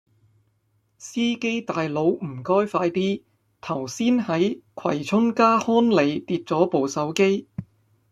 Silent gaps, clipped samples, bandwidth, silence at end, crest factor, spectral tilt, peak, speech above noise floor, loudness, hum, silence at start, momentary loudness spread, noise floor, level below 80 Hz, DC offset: none; under 0.1%; 12.5 kHz; 0.5 s; 18 dB; -5.5 dB/octave; -4 dBFS; 46 dB; -23 LUFS; none; 1 s; 12 LU; -68 dBFS; -64 dBFS; under 0.1%